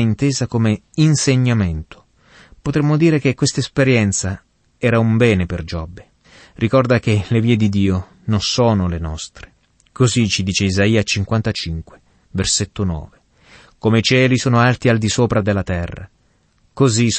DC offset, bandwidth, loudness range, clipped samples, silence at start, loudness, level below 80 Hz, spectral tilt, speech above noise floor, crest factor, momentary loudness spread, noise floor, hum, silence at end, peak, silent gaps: under 0.1%; 8.8 kHz; 2 LU; under 0.1%; 0 s; -17 LUFS; -38 dBFS; -5 dB/octave; 43 dB; 16 dB; 12 LU; -59 dBFS; none; 0 s; -2 dBFS; none